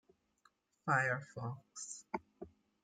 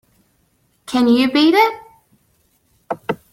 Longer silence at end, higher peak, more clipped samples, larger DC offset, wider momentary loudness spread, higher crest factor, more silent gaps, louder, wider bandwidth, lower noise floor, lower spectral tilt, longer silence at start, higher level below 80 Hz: first, 0.35 s vs 0.15 s; second, -18 dBFS vs -2 dBFS; neither; neither; first, 23 LU vs 16 LU; first, 24 dB vs 16 dB; neither; second, -39 LUFS vs -16 LUFS; second, 9.6 kHz vs 15.5 kHz; first, -75 dBFS vs -62 dBFS; about the same, -5 dB/octave vs -4.5 dB/octave; about the same, 0.85 s vs 0.9 s; second, -78 dBFS vs -60 dBFS